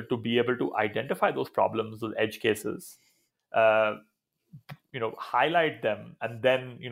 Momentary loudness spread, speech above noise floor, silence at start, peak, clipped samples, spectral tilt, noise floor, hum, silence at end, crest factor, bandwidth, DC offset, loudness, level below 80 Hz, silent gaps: 14 LU; 27 dB; 0 s; -10 dBFS; under 0.1%; -5 dB/octave; -55 dBFS; none; 0 s; 18 dB; 16 kHz; under 0.1%; -28 LUFS; -74 dBFS; none